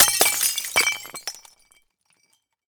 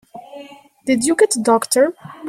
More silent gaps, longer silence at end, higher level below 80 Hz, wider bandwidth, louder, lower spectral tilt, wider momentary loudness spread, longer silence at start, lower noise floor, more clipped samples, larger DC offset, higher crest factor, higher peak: neither; first, 1.35 s vs 0 s; about the same, -62 dBFS vs -62 dBFS; first, over 20 kHz vs 16 kHz; second, -19 LUFS vs -16 LUFS; second, 1.5 dB/octave vs -3 dB/octave; second, 17 LU vs 23 LU; second, 0 s vs 0.15 s; first, -68 dBFS vs -39 dBFS; neither; neither; first, 24 dB vs 16 dB; about the same, 0 dBFS vs -2 dBFS